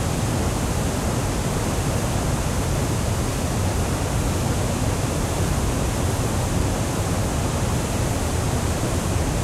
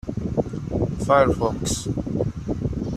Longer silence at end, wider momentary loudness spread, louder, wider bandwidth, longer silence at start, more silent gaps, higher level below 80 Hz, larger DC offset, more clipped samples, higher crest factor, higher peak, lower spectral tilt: about the same, 0 s vs 0 s; second, 1 LU vs 9 LU; about the same, -23 LUFS vs -23 LUFS; first, 16 kHz vs 14 kHz; about the same, 0 s vs 0.05 s; neither; first, -30 dBFS vs -38 dBFS; neither; neither; second, 12 dB vs 20 dB; second, -10 dBFS vs -4 dBFS; about the same, -5 dB/octave vs -6 dB/octave